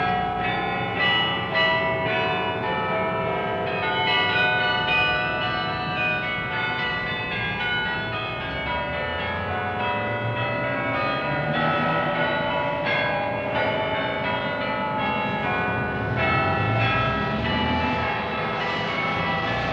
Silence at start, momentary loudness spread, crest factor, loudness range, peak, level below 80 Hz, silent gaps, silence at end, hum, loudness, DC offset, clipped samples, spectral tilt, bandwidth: 0 s; 6 LU; 14 dB; 4 LU; -10 dBFS; -46 dBFS; none; 0 s; none; -23 LUFS; under 0.1%; under 0.1%; -6.5 dB/octave; 8 kHz